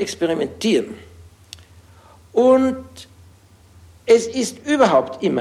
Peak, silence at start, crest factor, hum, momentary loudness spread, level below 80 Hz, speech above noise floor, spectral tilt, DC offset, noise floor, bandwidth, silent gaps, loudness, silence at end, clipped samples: -2 dBFS; 0 s; 18 dB; none; 18 LU; -54 dBFS; 31 dB; -4.5 dB/octave; under 0.1%; -49 dBFS; 13.5 kHz; none; -18 LUFS; 0 s; under 0.1%